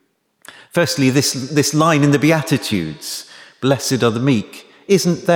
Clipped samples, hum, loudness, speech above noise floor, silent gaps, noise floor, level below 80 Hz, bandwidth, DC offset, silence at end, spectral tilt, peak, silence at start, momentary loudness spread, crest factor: under 0.1%; none; -16 LUFS; 30 dB; none; -46 dBFS; -56 dBFS; over 20 kHz; under 0.1%; 0 s; -5 dB/octave; -2 dBFS; 0.75 s; 13 LU; 16 dB